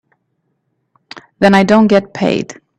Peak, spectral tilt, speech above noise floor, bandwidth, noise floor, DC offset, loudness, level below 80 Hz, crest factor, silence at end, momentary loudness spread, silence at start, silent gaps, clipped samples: 0 dBFS; -6.5 dB/octave; 56 dB; 10 kHz; -67 dBFS; under 0.1%; -12 LUFS; -52 dBFS; 14 dB; 0.25 s; 8 LU; 1.15 s; none; under 0.1%